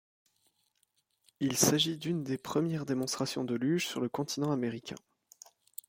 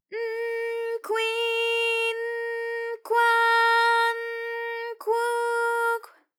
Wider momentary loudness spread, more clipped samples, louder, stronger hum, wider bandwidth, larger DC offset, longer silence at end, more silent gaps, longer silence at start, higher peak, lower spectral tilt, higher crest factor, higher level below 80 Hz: about the same, 11 LU vs 12 LU; neither; second, -32 LUFS vs -25 LUFS; neither; about the same, 16.5 kHz vs 17.5 kHz; neither; first, 0.9 s vs 0.3 s; neither; first, 1.4 s vs 0.1 s; about the same, -12 dBFS vs -12 dBFS; first, -4 dB/octave vs 2.5 dB/octave; first, 22 dB vs 14 dB; first, -72 dBFS vs under -90 dBFS